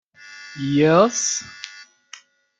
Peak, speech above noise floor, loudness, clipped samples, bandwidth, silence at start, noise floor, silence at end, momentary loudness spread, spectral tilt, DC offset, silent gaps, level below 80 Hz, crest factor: -2 dBFS; 29 dB; -19 LUFS; under 0.1%; 9.6 kHz; 0.25 s; -47 dBFS; 0.75 s; 22 LU; -4 dB/octave; under 0.1%; none; -62 dBFS; 20 dB